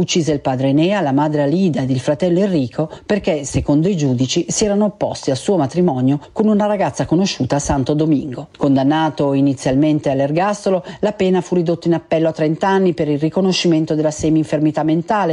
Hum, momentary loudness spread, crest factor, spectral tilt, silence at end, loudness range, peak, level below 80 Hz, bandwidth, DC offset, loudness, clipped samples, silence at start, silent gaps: none; 4 LU; 12 dB; -6 dB/octave; 0 s; 1 LU; -4 dBFS; -42 dBFS; 11.5 kHz; under 0.1%; -17 LUFS; under 0.1%; 0 s; none